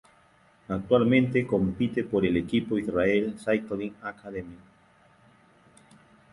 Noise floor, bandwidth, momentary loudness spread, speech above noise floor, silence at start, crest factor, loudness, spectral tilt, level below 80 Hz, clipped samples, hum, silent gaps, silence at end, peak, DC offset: -60 dBFS; 11.5 kHz; 16 LU; 34 dB; 0.7 s; 20 dB; -26 LUFS; -7.5 dB/octave; -54 dBFS; under 0.1%; none; none; 1.75 s; -8 dBFS; under 0.1%